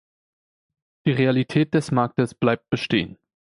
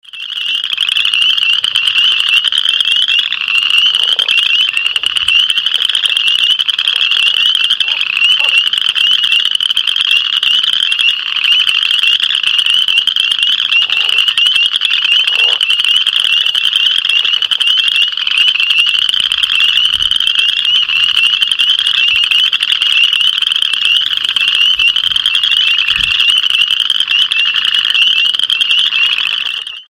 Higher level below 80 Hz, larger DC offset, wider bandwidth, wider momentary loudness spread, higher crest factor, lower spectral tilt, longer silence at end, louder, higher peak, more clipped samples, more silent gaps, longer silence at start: second, -56 dBFS vs -50 dBFS; neither; second, 11.5 kHz vs 17 kHz; about the same, 5 LU vs 3 LU; first, 18 dB vs 12 dB; first, -7 dB/octave vs 2.5 dB/octave; first, 0.25 s vs 0.05 s; second, -22 LUFS vs -9 LUFS; second, -4 dBFS vs 0 dBFS; second, under 0.1% vs 0.2%; neither; first, 1.05 s vs 0.15 s